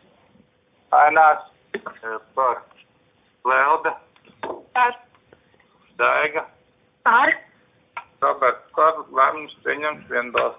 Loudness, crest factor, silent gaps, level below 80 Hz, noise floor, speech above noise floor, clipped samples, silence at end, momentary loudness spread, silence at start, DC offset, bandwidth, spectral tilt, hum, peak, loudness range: -20 LUFS; 20 dB; none; -68 dBFS; -61 dBFS; 41 dB; under 0.1%; 0.05 s; 18 LU; 0.9 s; under 0.1%; 3.8 kHz; -6.5 dB/octave; none; -2 dBFS; 4 LU